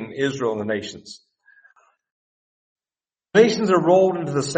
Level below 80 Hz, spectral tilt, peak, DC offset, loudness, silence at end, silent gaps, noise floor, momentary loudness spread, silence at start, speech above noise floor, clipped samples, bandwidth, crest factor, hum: -64 dBFS; -5.5 dB/octave; -2 dBFS; under 0.1%; -19 LUFS; 0 s; 2.12-2.76 s; under -90 dBFS; 12 LU; 0 s; over 71 dB; under 0.1%; 8.8 kHz; 20 dB; none